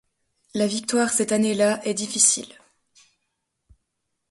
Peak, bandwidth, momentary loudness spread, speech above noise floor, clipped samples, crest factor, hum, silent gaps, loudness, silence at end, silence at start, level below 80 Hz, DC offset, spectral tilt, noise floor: -4 dBFS; 12 kHz; 9 LU; 56 dB; under 0.1%; 22 dB; none; none; -21 LUFS; 1.85 s; 0.55 s; -66 dBFS; under 0.1%; -2.5 dB/octave; -78 dBFS